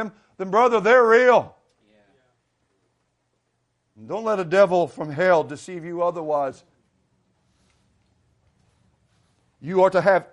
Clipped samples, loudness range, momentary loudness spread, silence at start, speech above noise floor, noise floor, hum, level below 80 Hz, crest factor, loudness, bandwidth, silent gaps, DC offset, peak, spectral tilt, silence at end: under 0.1%; 11 LU; 18 LU; 0 s; 53 dB; -72 dBFS; none; -68 dBFS; 18 dB; -19 LUFS; 11 kHz; none; under 0.1%; -4 dBFS; -6 dB/octave; 0.1 s